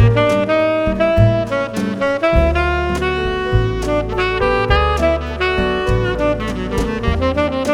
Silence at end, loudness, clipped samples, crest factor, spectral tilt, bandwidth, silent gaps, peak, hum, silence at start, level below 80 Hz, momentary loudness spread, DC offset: 0 s; -17 LUFS; under 0.1%; 16 dB; -6.5 dB/octave; 13 kHz; none; 0 dBFS; none; 0 s; -24 dBFS; 5 LU; under 0.1%